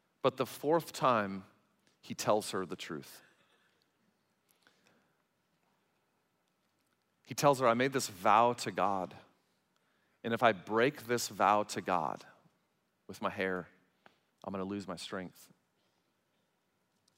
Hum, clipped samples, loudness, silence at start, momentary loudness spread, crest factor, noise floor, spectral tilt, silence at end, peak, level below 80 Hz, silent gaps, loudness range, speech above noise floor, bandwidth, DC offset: none; under 0.1%; -33 LUFS; 0.25 s; 17 LU; 24 dB; -79 dBFS; -4.5 dB/octave; 1.9 s; -12 dBFS; -84 dBFS; none; 13 LU; 46 dB; 16 kHz; under 0.1%